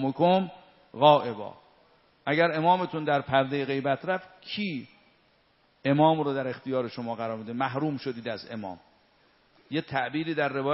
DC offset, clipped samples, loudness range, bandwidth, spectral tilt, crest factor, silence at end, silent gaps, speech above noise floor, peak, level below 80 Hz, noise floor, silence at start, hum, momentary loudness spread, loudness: under 0.1%; under 0.1%; 7 LU; 5.8 kHz; -4 dB/octave; 24 dB; 0 s; none; 39 dB; -4 dBFS; -70 dBFS; -65 dBFS; 0 s; none; 15 LU; -27 LUFS